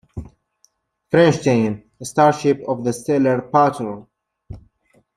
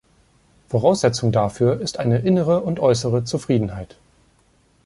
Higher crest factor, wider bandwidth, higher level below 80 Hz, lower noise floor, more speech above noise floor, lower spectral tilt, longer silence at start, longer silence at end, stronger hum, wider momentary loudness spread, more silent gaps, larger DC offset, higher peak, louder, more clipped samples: about the same, 18 dB vs 18 dB; first, 14 kHz vs 11.5 kHz; about the same, -50 dBFS vs -48 dBFS; about the same, -62 dBFS vs -59 dBFS; first, 45 dB vs 40 dB; about the same, -6.5 dB/octave vs -6.5 dB/octave; second, 0.15 s vs 0.7 s; second, 0.6 s vs 1 s; neither; first, 15 LU vs 7 LU; neither; neither; about the same, -2 dBFS vs -4 dBFS; about the same, -18 LUFS vs -20 LUFS; neither